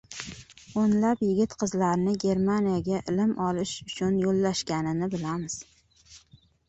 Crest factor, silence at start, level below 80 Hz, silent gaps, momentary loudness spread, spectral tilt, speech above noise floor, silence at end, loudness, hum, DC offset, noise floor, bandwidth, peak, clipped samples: 16 dB; 0.1 s; -56 dBFS; none; 11 LU; -6 dB/octave; 33 dB; 0.5 s; -27 LUFS; none; under 0.1%; -59 dBFS; 8.2 kHz; -12 dBFS; under 0.1%